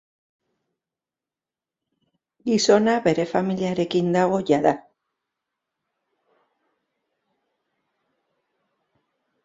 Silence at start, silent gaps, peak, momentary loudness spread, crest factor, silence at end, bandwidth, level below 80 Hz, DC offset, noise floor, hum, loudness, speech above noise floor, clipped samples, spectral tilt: 2.45 s; none; -4 dBFS; 7 LU; 22 dB; 4.65 s; 8 kHz; -66 dBFS; under 0.1%; -90 dBFS; none; -21 LUFS; 70 dB; under 0.1%; -5.5 dB/octave